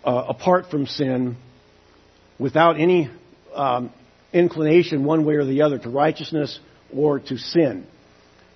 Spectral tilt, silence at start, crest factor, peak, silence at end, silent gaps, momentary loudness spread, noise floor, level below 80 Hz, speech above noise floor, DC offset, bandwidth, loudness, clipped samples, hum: -7.5 dB/octave; 0.05 s; 20 dB; -2 dBFS; 0.7 s; none; 12 LU; -53 dBFS; -64 dBFS; 34 dB; under 0.1%; 6.2 kHz; -21 LUFS; under 0.1%; none